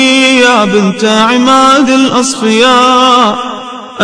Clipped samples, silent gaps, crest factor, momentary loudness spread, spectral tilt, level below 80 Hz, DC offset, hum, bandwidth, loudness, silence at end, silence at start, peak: 3%; none; 8 dB; 8 LU; -3 dB/octave; -48 dBFS; under 0.1%; none; 11 kHz; -6 LUFS; 0 s; 0 s; 0 dBFS